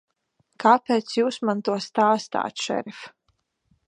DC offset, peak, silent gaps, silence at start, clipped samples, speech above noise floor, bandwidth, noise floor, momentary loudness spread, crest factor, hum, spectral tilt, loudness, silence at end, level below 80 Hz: under 0.1%; -2 dBFS; none; 0.6 s; under 0.1%; 49 dB; 10 kHz; -71 dBFS; 13 LU; 22 dB; none; -4.5 dB/octave; -23 LUFS; 0.8 s; -74 dBFS